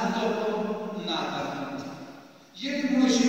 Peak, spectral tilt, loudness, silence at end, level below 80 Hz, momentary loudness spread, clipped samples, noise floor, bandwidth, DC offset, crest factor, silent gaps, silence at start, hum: -10 dBFS; -4.5 dB/octave; -29 LUFS; 0 s; -68 dBFS; 19 LU; under 0.1%; -48 dBFS; 16 kHz; under 0.1%; 18 dB; none; 0 s; none